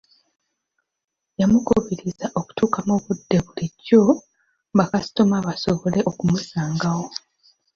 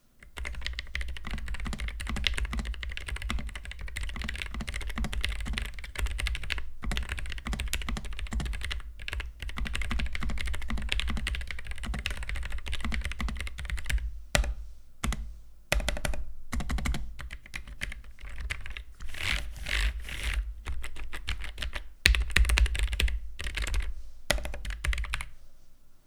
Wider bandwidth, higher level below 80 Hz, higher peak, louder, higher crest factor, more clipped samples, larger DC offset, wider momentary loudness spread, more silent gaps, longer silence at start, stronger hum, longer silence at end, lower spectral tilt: second, 7.4 kHz vs 17.5 kHz; second, -50 dBFS vs -34 dBFS; about the same, -2 dBFS vs -2 dBFS; first, -21 LUFS vs -34 LUFS; second, 20 dB vs 30 dB; neither; neither; about the same, 11 LU vs 10 LU; neither; first, 1.4 s vs 0.2 s; neither; first, 0.6 s vs 0.1 s; first, -6.5 dB/octave vs -3.5 dB/octave